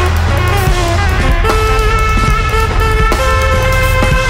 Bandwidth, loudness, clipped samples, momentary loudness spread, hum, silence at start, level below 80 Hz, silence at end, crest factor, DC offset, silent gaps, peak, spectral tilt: 16.5 kHz; -12 LUFS; under 0.1%; 1 LU; none; 0 s; -14 dBFS; 0 s; 8 dB; under 0.1%; none; -2 dBFS; -5 dB/octave